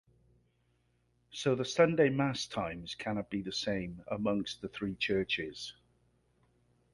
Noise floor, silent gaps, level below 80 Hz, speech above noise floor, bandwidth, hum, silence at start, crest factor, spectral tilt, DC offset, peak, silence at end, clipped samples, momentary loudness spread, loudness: -74 dBFS; none; -62 dBFS; 41 dB; 11.5 kHz; 60 Hz at -60 dBFS; 1.3 s; 22 dB; -5 dB/octave; under 0.1%; -14 dBFS; 1.2 s; under 0.1%; 12 LU; -33 LUFS